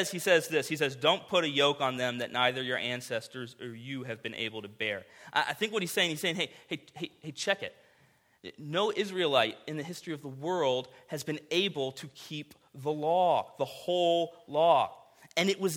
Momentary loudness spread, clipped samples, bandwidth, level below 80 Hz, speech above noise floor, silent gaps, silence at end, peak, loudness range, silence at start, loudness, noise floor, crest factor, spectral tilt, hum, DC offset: 15 LU; under 0.1%; 18 kHz; -78 dBFS; 35 dB; none; 0 s; -10 dBFS; 5 LU; 0 s; -30 LUFS; -66 dBFS; 22 dB; -3.5 dB/octave; none; under 0.1%